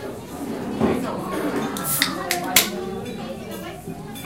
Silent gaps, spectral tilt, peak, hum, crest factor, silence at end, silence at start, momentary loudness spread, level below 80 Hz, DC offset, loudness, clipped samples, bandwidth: none; -3 dB/octave; 0 dBFS; none; 26 dB; 0 s; 0 s; 15 LU; -50 dBFS; 0.1%; -24 LUFS; under 0.1%; 17 kHz